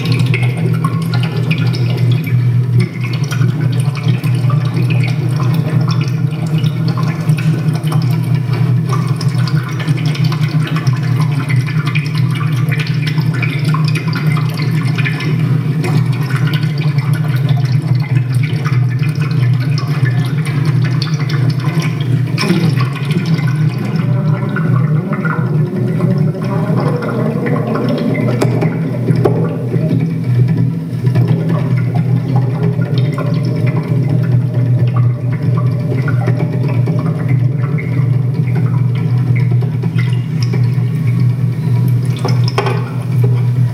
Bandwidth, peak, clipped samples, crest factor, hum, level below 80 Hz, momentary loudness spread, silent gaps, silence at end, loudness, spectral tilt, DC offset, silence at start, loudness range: 14.5 kHz; 0 dBFS; under 0.1%; 14 dB; none; -50 dBFS; 3 LU; none; 0 s; -14 LUFS; -7.5 dB/octave; under 0.1%; 0 s; 1 LU